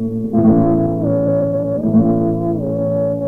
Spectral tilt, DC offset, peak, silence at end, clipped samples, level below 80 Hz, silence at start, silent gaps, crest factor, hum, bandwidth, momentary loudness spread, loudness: -12.5 dB/octave; under 0.1%; -2 dBFS; 0 s; under 0.1%; -40 dBFS; 0 s; none; 14 dB; none; 2.1 kHz; 6 LU; -16 LUFS